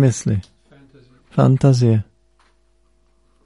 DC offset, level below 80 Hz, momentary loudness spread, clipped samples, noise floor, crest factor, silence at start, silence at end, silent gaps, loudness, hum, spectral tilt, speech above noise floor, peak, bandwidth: under 0.1%; -48 dBFS; 11 LU; under 0.1%; -60 dBFS; 16 dB; 0 s; 1.45 s; none; -17 LUFS; none; -7.5 dB/octave; 46 dB; -2 dBFS; 11.5 kHz